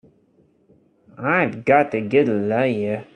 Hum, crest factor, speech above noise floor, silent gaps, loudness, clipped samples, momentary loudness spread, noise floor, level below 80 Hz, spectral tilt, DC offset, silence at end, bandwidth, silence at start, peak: none; 20 dB; 40 dB; none; -20 LUFS; under 0.1%; 5 LU; -59 dBFS; -62 dBFS; -8 dB/octave; under 0.1%; 0.1 s; 9.8 kHz; 1.2 s; -2 dBFS